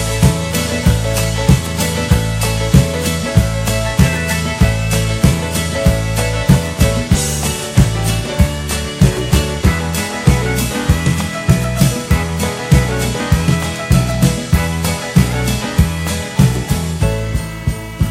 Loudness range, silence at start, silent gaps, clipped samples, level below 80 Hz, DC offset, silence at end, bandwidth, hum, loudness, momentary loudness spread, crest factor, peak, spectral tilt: 1 LU; 0 s; none; under 0.1%; -22 dBFS; under 0.1%; 0 s; 16.5 kHz; none; -15 LUFS; 5 LU; 14 dB; 0 dBFS; -5 dB/octave